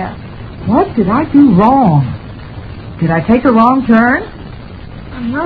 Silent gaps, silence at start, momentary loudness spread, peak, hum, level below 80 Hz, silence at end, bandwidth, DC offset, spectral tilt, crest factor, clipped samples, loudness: none; 0 s; 21 LU; 0 dBFS; none; -34 dBFS; 0 s; 4.9 kHz; under 0.1%; -10.5 dB/octave; 12 dB; 0.2%; -10 LUFS